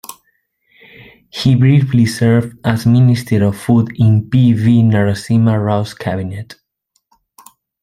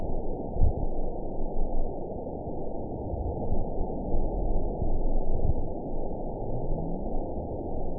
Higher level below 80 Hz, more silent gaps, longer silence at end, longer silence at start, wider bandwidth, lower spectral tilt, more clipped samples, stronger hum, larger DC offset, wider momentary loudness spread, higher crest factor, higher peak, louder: second, -48 dBFS vs -30 dBFS; neither; first, 1.3 s vs 0 s; about the same, 0.1 s vs 0 s; first, 15 kHz vs 1 kHz; second, -7.5 dB/octave vs -17.5 dB/octave; neither; neither; second, under 0.1% vs 0.6%; first, 11 LU vs 5 LU; about the same, 12 dB vs 16 dB; first, -2 dBFS vs -10 dBFS; first, -13 LUFS vs -34 LUFS